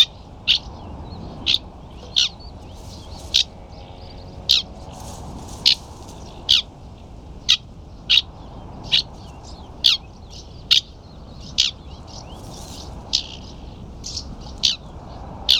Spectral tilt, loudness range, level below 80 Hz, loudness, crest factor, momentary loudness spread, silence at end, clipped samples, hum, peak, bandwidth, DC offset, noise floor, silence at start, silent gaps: -1 dB/octave; 7 LU; -40 dBFS; -19 LUFS; 24 dB; 22 LU; 0 s; under 0.1%; none; 0 dBFS; over 20 kHz; under 0.1%; -40 dBFS; 0 s; none